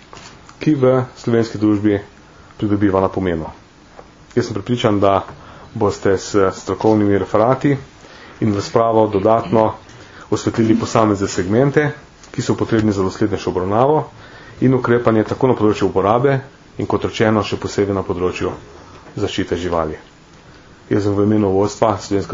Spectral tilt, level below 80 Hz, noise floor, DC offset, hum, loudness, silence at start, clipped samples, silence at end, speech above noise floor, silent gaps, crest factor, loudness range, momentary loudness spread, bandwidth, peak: -6.5 dB/octave; -46 dBFS; -43 dBFS; under 0.1%; none; -17 LUFS; 0.15 s; under 0.1%; 0 s; 27 dB; none; 18 dB; 4 LU; 10 LU; 7.6 kHz; 0 dBFS